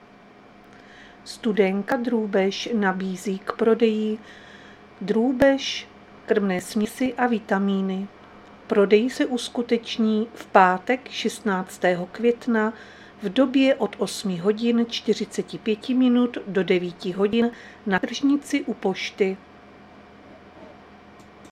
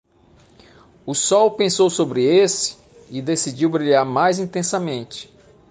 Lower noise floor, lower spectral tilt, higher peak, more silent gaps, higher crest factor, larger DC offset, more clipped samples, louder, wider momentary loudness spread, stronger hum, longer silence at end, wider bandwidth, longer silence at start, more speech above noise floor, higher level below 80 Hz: second, -49 dBFS vs -53 dBFS; first, -5.5 dB/octave vs -4 dB/octave; first, 0 dBFS vs -4 dBFS; neither; first, 24 dB vs 16 dB; neither; neither; second, -23 LUFS vs -19 LUFS; second, 10 LU vs 13 LU; neither; first, 0.75 s vs 0.45 s; first, 14 kHz vs 10 kHz; about the same, 0.95 s vs 1.05 s; second, 27 dB vs 35 dB; about the same, -60 dBFS vs -60 dBFS